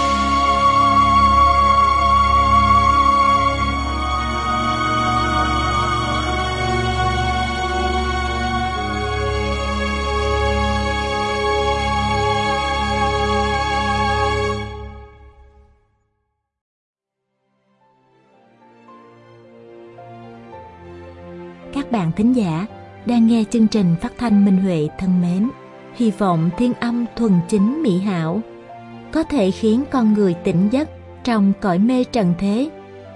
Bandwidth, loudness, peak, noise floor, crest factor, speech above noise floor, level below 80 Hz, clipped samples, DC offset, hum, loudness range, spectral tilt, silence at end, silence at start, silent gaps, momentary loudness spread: 11 kHz; -18 LUFS; -4 dBFS; -75 dBFS; 14 dB; 58 dB; -30 dBFS; under 0.1%; under 0.1%; none; 8 LU; -6 dB/octave; 0 s; 0 s; 16.61-16.94 s; 15 LU